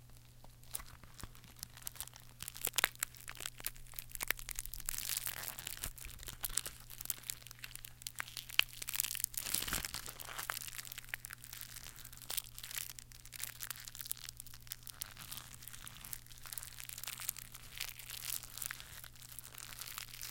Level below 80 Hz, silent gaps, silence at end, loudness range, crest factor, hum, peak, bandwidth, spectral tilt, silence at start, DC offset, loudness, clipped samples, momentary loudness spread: -58 dBFS; none; 0 s; 7 LU; 38 dB; none; -8 dBFS; 17 kHz; 0 dB/octave; 0 s; under 0.1%; -42 LUFS; under 0.1%; 14 LU